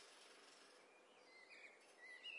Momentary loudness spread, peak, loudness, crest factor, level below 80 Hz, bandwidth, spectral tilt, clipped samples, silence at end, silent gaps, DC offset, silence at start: 7 LU; -44 dBFS; -63 LUFS; 18 dB; under -90 dBFS; 12 kHz; 0.5 dB/octave; under 0.1%; 0 s; none; under 0.1%; 0 s